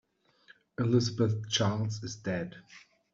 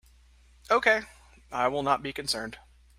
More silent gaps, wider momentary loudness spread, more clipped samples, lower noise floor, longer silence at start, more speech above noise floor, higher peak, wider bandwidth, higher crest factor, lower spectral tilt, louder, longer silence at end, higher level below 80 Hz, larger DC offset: neither; about the same, 14 LU vs 15 LU; neither; first, -62 dBFS vs -58 dBFS; about the same, 0.8 s vs 0.7 s; about the same, 32 dB vs 31 dB; second, -14 dBFS vs -8 dBFS; second, 7.6 kHz vs 16 kHz; about the same, 18 dB vs 22 dB; first, -5.5 dB/octave vs -3 dB/octave; second, -31 LUFS vs -27 LUFS; about the same, 0.35 s vs 0.4 s; second, -66 dBFS vs -56 dBFS; neither